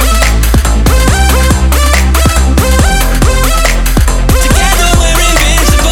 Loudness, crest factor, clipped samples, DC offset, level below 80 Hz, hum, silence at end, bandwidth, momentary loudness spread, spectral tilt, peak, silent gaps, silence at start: -8 LUFS; 6 dB; 0.3%; under 0.1%; -8 dBFS; none; 0 s; 17 kHz; 2 LU; -4 dB/octave; 0 dBFS; none; 0 s